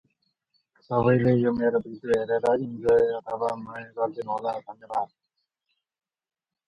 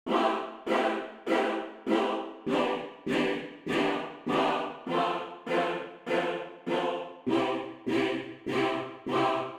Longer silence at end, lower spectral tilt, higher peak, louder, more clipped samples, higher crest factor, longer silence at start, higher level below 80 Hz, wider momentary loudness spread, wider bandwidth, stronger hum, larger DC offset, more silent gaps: first, 1.65 s vs 0 s; first, -8.5 dB/octave vs -5.5 dB/octave; first, -8 dBFS vs -14 dBFS; first, -25 LUFS vs -30 LUFS; neither; about the same, 18 dB vs 16 dB; first, 0.9 s vs 0.05 s; first, -60 dBFS vs -68 dBFS; first, 11 LU vs 7 LU; second, 10.5 kHz vs 13 kHz; neither; neither; neither